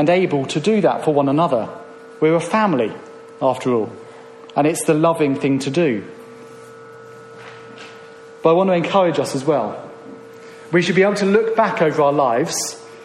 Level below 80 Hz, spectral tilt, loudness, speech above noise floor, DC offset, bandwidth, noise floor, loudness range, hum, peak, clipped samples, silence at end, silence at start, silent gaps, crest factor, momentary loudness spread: -64 dBFS; -5.5 dB/octave; -18 LUFS; 23 dB; under 0.1%; 13 kHz; -39 dBFS; 4 LU; none; -2 dBFS; under 0.1%; 0 s; 0 s; none; 16 dB; 23 LU